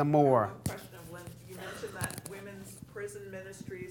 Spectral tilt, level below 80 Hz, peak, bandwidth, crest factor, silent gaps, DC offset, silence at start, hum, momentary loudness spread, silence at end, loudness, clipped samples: -6 dB/octave; -62 dBFS; -12 dBFS; 19.5 kHz; 22 dB; none; under 0.1%; 0 s; none; 21 LU; 0 s; -33 LUFS; under 0.1%